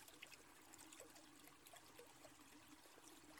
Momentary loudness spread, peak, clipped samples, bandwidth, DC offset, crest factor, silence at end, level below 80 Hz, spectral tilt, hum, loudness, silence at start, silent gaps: 4 LU; -42 dBFS; under 0.1%; 19 kHz; under 0.1%; 22 dB; 0 s; -86 dBFS; -2 dB/octave; none; -62 LUFS; 0 s; none